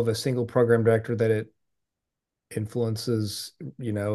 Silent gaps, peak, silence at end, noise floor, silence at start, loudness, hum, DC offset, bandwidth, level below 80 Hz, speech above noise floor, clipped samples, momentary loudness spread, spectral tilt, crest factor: none; -8 dBFS; 0 s; -86 dBFS; 0 s; -26 LUFS; none; under 0.1%; 12.5 kHz; -68 dBFS; 61 dB; under 0.1%; 14 LU; -6.5 dB/octave; 18 dB